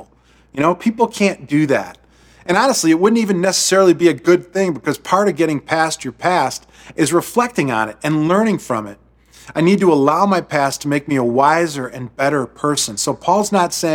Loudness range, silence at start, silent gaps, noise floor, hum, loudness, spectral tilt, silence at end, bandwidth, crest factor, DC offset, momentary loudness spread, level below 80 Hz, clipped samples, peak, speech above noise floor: 3 LU; 0 s; none; -52 dBFS; none; -16 LUFS; -4.5 dB/octave; 0 s; 17.5 kHz; 16 dB; under 0.1%; 8 LU; -54 dBFS; under 0.1%; 0 dBFS; 36 dB